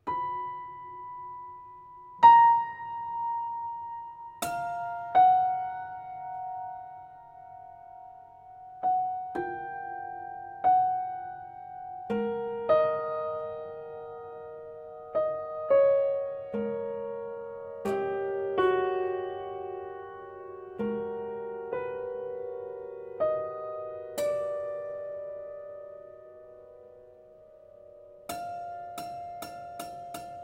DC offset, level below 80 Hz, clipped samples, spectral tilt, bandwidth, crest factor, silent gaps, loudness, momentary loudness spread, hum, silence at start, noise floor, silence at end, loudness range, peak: under 0.1%; -68 dBFS; under 0.1%; -5 dB/octave; 16 kHz; 24 dB; none; -29 LUFS; 21 LU; none; 0.05 s; -53 dBFS; 0 s; 16 LU; -8 dBFS